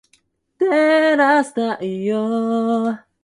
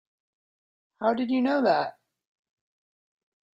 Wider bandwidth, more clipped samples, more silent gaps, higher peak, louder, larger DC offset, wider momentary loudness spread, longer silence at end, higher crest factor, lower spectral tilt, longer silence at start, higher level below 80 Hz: first, 11.5 kHz vs 7.4 kHz; neither; neither; first, -4 dBFS vs -10 dBFS; first, -18 LUFS vs -26 LUFS; neither; about the same, 8 LU vs 6 LU; second, 0.25 s vs 1.65 s; second, 14 dB vs 20 dB; second, -5.5 dB/octave vs -7 dB/octave; second, 0.6 s vs 1 s; first, -68 dBFS vs -76 dBFS